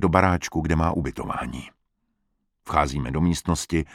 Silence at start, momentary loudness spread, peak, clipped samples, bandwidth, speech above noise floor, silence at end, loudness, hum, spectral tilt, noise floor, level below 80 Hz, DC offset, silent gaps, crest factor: 0 s; 10 LU; 0 dBFS; under 0.1%; 15 kHz; 51 dB; 0 s; -24 LUFS; none; -6 dB/octave; -74 dBFS; -36 dBFS; under 0.1%; none; 24 dB